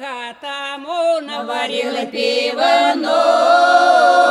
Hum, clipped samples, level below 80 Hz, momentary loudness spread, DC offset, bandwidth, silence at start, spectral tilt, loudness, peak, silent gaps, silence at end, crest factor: none; under 0.1%; -72 dBFS; 14 LU; under 0.1%; 12 kHz; 0 s; -1.5 dB/octave; -15 LUFS; -2 dBFS; none; 0 s; 14 dB